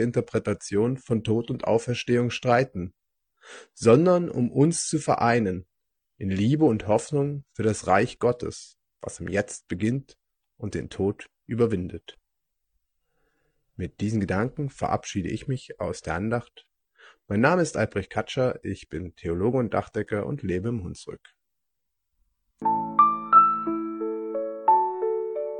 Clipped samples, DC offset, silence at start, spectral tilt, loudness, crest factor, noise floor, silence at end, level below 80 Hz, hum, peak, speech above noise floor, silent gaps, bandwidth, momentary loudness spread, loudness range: under 0.1%; under 0.1%; 0 s; -6 dB/octave; -25 LUFS; 22 dB; -83 dBFS; 0 s; -58 dBFS; none; -4 dBFS; 58 dB; none; 10 kHz; 14 LU; 8 LU